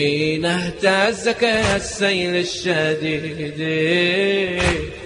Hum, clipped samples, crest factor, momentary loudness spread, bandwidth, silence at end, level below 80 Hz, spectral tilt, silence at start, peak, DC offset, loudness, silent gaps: none; under 0.1%; 16 dB; 6 LU; 10.5 kHz; 0 s; -40 dBFS; -4.5 dB/octave; 0 s; -4 dBFS; under 0.1%; -19 LUFS; none